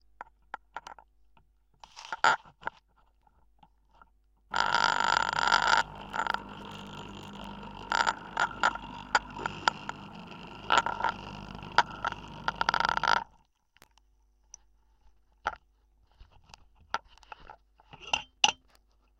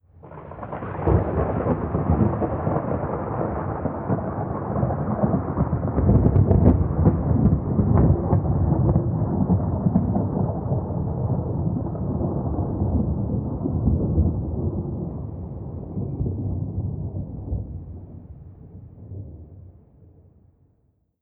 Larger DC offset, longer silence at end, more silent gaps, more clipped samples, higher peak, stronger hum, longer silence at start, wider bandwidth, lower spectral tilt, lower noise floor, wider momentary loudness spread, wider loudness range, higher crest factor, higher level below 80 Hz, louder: neither; second, 0.65 s vs 1.5 s; neither; neither; about the same, -4 dBFS vs -4 dBFS; neither; about the same, 0.2 s vs 0.25 s; first, 10 kHz vs 2.8 kHz; second, -1.5 dB/octave vs -15 dB/octave; about the same, -67 dBFS vs -66 dBFS; first, 21 LU vs 18 LU; first, 15 LU vs 12 LU; first, 30 dB vs 18 dB; second, -58 dBFS vs -34 dBFS; second, -29 LUFS vs -23 LUFS